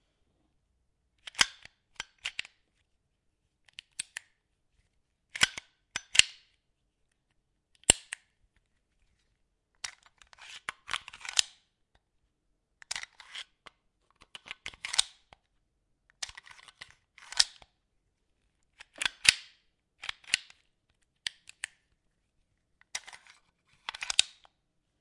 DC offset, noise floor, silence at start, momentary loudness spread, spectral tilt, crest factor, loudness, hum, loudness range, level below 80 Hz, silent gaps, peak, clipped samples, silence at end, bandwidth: under 0.1%; -77 dBFS; 1.4 s; 25 LU; 1 dB/octave; 38 dB; -30 LUFS; none; 14 LU; -64 dBFS; none; 0 dBFS; under 0.1%; 0.75 s; 12 kHz